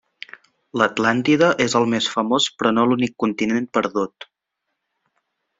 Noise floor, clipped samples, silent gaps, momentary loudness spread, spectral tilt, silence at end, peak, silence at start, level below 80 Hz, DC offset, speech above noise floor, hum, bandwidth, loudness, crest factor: -79 dBFS; under 0.1%; none; 13 LU; -4.5 dB/octave; 1.5 s; -2 dBFS; 0.75 s; -62 dBFS; under 0.1%; 60 dB; none; 7.8 kHz; -19 LUFS; 18 dB